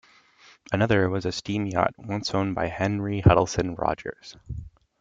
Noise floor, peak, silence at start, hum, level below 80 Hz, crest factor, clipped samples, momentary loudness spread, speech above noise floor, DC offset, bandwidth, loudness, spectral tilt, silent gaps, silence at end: -56 dBFS; -2 dBFS; 0.7 s; none; -44 dBFS; 22 dB; under 0.1%; 19 LU; 31 dB; under 0.1%; 7.8 kHz; -25 LUFS; -6 dB/octave; none; 0.35 s